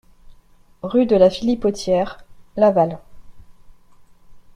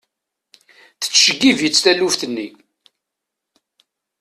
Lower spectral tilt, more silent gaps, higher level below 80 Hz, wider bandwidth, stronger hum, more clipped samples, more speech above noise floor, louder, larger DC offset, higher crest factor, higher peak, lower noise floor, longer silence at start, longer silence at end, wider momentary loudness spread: first, -6.5 dB/octave vs -1.5 dB/octave; neither; first, -46 dBFS vs -62 dBFS; second, 11 kHz vs 14.5 kHz; neither; neither; second, 33 dB vs 65 dB; second, -18 LUFS vs -14 LUFS; neither; about the same, 18 dB vs 20 dB; about the same, -2 dBFS vs 0 dBFS; second, -50 dBFS vs -81 dBFS; second, 0.3 s vs 1 s; second, 0.15 s vs 1.7 s; first, 17 LU vs 14 LU